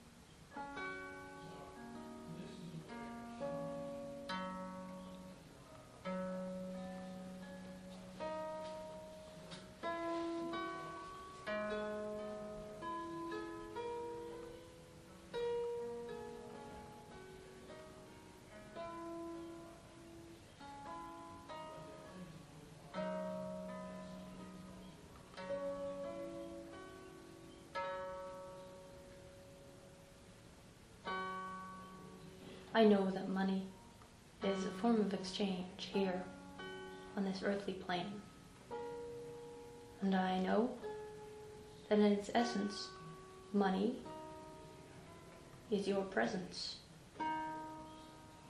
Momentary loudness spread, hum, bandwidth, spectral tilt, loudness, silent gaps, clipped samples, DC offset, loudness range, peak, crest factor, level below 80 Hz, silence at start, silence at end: 20 LU; none; 12.5 kHz; -6 dB/octave; -43 LUFS; none; under 0.1%; under 0.1%; 13 LU; -18 dBFS; 24 dB; -68 dBFS; 0 s; 0 s